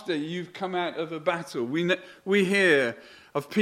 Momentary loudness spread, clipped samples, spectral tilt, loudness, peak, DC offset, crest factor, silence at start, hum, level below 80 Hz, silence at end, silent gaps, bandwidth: 13 LU; under 0.1%; -5 dB/octave; -26 LUFS; -8 dBFS; under 0.1%; 18 dB; 0 s; none; -74 dBFS; 0 s; none; 15.5 kHz